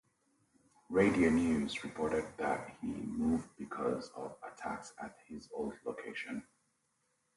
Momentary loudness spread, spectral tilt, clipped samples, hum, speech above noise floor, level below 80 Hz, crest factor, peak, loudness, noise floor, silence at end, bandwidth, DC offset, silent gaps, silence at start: 17 LU; -6 dB/octave; under 0.1%; none; 43 dB; -60 dBFS; 22 dB; -16 dBFS; -36 LUFS; -79 dBFS; 0.95 s; 11.5 kHz; under 0.1%; none; 0.9 s